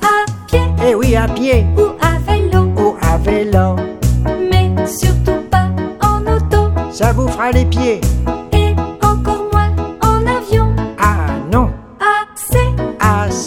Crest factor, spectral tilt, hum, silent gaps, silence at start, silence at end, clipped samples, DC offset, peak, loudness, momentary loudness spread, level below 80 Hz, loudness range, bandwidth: 12 dB; -6 dB/octave; none; none; 0 s; 0 s; under 0.1%; under 0.1%; 0 dBFS; -14 LUFS; 4 LU; -20 dBFS; 1 LU; 16.5 kHz